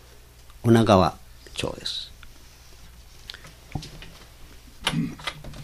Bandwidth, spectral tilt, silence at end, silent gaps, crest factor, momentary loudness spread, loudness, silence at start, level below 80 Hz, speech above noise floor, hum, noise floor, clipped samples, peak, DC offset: 15.5 kHz; -6 dB/octave; 0 s; none; 26 dB; 24 LU; -24 LUFS; 0.6 s; -46 dBFS; 28 dB; none; -48 dBFS; under 0.1%; -2 dBFS; under 0.1%